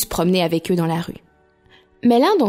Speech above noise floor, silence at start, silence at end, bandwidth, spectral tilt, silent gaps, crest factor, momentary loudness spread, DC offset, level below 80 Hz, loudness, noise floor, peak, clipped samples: 37 dB; 0 s; 0 s; 16 kHz; -5.5 dB/octave; none; 14 dB; 14 LU; under 0.1%; -46 dBFS; -19 LUFS; -54 dBFS; -6 dBFS; under 0.1%